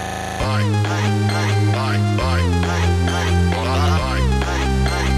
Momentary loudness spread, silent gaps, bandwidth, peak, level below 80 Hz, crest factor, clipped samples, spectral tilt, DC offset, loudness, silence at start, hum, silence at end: 2 LU; none; 13.5 kHz; -6 dBFS; -26 dBFS; 12 dB; under 0.1%; -5.5 dB/octave; under 0.1%; -19 LUFS; 0 s; none; 0 s